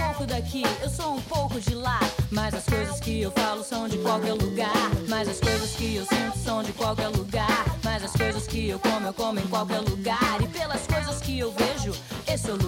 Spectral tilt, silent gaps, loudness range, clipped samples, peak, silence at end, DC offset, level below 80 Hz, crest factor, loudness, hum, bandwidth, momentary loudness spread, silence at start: -5 dB/octave; none; 1 LU; under 0.1%; -10 dBFS; 0 s; under 0.1%; -38 dBFS; 16 dB; -27 LUFS; none; 17 kHz; 4 LU; 0 s